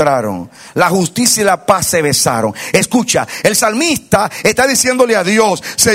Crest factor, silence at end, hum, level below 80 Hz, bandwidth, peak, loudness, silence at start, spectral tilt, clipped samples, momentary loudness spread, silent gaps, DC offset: 12 dB; 0 s; none; -46 dBFS; over 20 kHz; 0 dBFS; -12 LUFS; 0 s; -3 dB/octave; 0.2%; 4 LU; none; under 0.1%